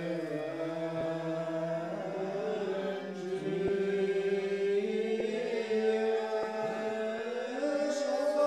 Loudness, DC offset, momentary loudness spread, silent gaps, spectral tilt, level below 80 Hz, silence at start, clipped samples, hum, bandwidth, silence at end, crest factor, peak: -33 LUFS; under 0.1%; 5 LU; none; -6 dB/octave; -72 dBFS; 0 s; under 0.1%; none; 11.5 kHz; 0 s; 14 dB; -18 dBFS